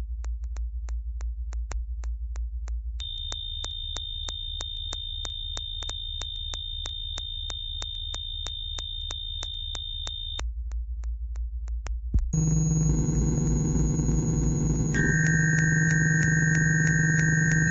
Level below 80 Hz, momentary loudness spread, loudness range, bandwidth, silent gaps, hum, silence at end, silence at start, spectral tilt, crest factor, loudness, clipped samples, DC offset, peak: -34 dBFS; 13 LU; 10 LU; 8 kHz; none; none; 0 s; 0 s; -4 dB/octave; 16 dB; -28 LUFS; under 0.1%; under 0.1%; -10 dBFS